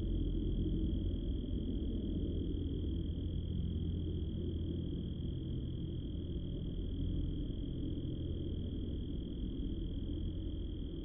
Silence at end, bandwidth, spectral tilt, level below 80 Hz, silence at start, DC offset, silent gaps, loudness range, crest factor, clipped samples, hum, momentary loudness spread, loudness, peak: 0 s; 3.7 kHz; -13.5 dB/octave; -42 dBFS; 0 s; under 0.1%; none; 2 LU; 12 dB; under 0.1%; none; 4 LU; -40 LUFS; -26 dBFS